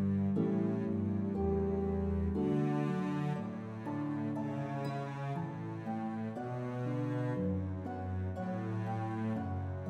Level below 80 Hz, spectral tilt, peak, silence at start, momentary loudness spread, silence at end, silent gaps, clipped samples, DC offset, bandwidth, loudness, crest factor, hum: -52 dBFS; -9.5 dB/octave; -22 dBFS; 0 s; 7 LU; 0 s; none; under 0.1%; under 0.1%; 8.6 kHz; -36 LUFS; 14 dB; none